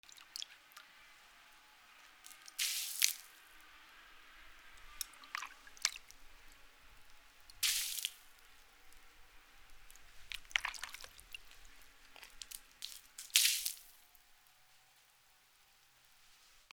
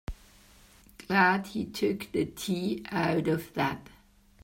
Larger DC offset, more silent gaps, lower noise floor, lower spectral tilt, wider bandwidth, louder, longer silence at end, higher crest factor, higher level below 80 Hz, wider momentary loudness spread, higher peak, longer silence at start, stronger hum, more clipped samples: neither; neither; first, -68 dBFS vs -57 dBFS; second, 3.5 dB/octave vs -5.5 dB/octave; first, over 20 kHz vs 16.5 kHz; second, -37 LUFS vs -29 LUFS; second, 0.45 s vs 0.6 s; first, 40 dB vs 22 dB; second, -68 dBFS vs -52 dBFS; first, 27 LU vs 17 LU; about the same, -6 dBFS vs -8 dBFS; about the same, 0.1 s vs 0.1 s; neither; neither